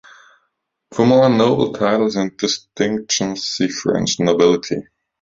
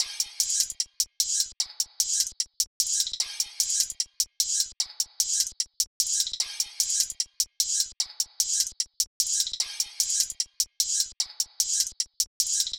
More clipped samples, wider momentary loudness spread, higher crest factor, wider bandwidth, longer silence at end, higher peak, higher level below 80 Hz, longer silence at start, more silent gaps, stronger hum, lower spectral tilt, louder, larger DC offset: neither; first, 8 LU vs 4 LU; second, 16 dB vs 22 dB; second, 7.8 kHz vs over 20 kHz; first, 0.4 s vs 0 s; first, -2 dBFS vs -6 dBFS; first, -54 dBFS vs -64 dBFS; first, 0.9 s vs 0 s; second, none vs 2.67-2.80 s, 5.87-6.00 s, 9.07-9.20 s, 12.27-12.40 s; neither; first, -4.5 dB/octave vs 5 dB/octave; first, -17 LUFS vs -26 LUFS; neither